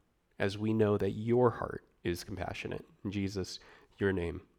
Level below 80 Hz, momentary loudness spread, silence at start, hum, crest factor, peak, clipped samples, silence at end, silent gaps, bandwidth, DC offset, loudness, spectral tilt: -58 dBFS; 13 LU; 0.4 s; none; 20 dB; -14 dBFS; under 0.1%; 0.15 s; none; 15.5 kHz; under 0.1%; -34 LUFS; -6.5 dB/octave